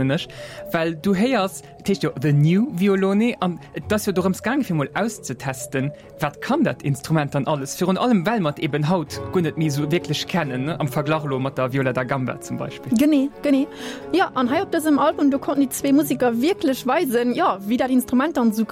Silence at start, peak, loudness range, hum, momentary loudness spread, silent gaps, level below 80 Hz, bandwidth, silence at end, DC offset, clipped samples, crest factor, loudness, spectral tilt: 0 s; -8 dBFS; 4 LU; none; 8 LU; none; -54 dBFS; 16.5 kHz; 0 s; under 0.1%; under 0.1%; 14 dB; -21 LUFS; -6 dB/octave